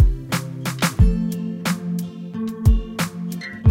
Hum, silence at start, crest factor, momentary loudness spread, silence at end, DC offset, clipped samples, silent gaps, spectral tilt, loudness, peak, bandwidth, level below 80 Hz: none; 0 s; 16 dB; 10 LU; 0 s; under 0.1%; under 0.1%; none; -6 dB/octave; -23 LUFS; -4 dBFS; 16.5 kHz; -24 dBFS